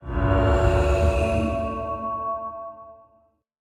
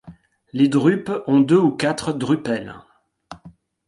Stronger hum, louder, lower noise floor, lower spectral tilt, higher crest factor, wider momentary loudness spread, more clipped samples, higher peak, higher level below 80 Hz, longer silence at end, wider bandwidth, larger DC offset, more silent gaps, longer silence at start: neither; second, -23 LUFS vs -19 LUFS; first, -63 dBFS vs -48 dBFS; about the same, -7.5 dB/octave vs -6.5 dB/octave; about the same, 16 dB vs 18 dB; first, 15 LU vs 11 LU; neither; second, -8 dBFS vs -4 dBFS; first, -28 dBFS vs -58 dBFS; first, 0.65 s vs 0.4 s; about the same, 11 kHz vs 11.5 kHz; neither; neither; about the same, 0 s vs 0.05 s